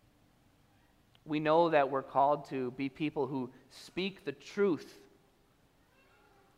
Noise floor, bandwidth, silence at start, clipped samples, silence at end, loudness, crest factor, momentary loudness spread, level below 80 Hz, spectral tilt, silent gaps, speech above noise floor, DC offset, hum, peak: -68 dBFS; 14.5 kHz; 1.25 s; under 0.1%; 1.65 s; -33 LUFS; 20 dB; 16 LU; -72 dBFS; -6.5 dB/octave; none; 36 dB; under 0.1%; none; -14 dBFS